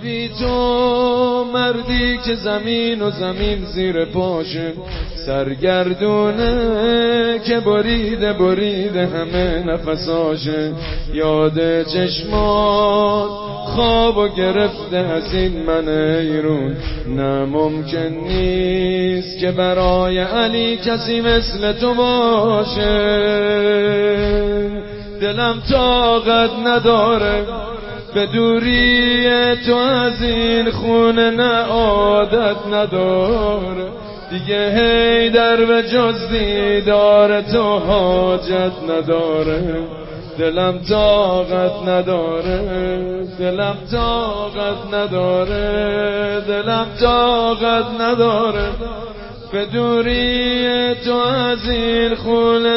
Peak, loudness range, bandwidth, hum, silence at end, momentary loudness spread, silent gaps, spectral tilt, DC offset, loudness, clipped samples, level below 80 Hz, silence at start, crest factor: -2 dBFS; 4 LU; 5.8 kHz; none; 0 s; 9 LU; none; -9.5 dB/octave; under 0.1%; -16 LUFS; under 0.1%; -32 dBFS; 0 s; 14 dB